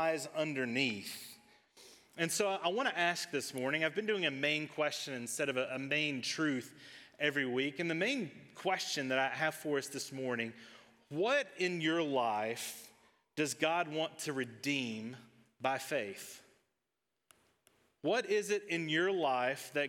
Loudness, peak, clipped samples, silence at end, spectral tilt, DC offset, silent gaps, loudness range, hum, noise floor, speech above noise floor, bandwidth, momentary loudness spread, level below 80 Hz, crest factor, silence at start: -35 LUFS; -16 dBFS; under 0.1%; 0 s; -3.5 dB/octave; under 0.1%; none; 5 LU; none; -87 dBFS; 52 dB; 17.5 kHz; 12 LU; -90 dBFS; 20 dB; 0 s